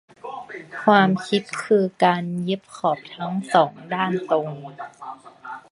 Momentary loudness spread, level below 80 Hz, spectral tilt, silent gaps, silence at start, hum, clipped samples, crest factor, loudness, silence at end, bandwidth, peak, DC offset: 20 LU; -70 dBFS; -6 dB/octave; none; 0.25 s; none; under 0.1%; 20 dB; -21 LUFS; 0.1 s; 11.5 kHz; -2 dBFS; under 0.1%